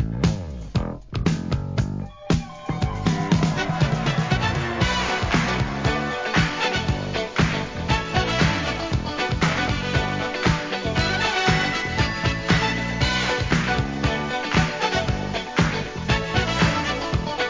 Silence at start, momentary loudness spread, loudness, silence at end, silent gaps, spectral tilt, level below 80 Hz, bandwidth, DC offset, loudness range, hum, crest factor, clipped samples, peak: 0 s; 6 LU; -23 LUFS; 0 s; none; -5 dB/octave; -34 dBFS; 7.6 kHz; 0.2%; 2 LU; none; 18 dB; under 0.1%; -4 dBFS